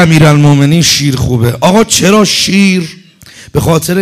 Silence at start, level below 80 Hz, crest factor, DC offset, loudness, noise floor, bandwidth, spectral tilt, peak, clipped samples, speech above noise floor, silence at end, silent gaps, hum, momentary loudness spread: 0 s; -34 dBFS; 8 dB; under 0.1%; -7 LUFS; -35 dBFS; 15.5 kHz; -4.5 dB/octave; 0 dBFS; 0.5%; 27 dB; 0 s; none; none; 8 LU